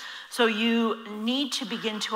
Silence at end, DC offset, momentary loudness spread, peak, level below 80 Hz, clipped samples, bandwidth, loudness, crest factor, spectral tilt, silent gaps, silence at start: 0 s; under 0.1%; 7 LU; -10 dBFS; -80 dBFS; under 0.1%; 16 kHz; -26 LUFS; 16 dB; -3 dB/octave; none; 0 s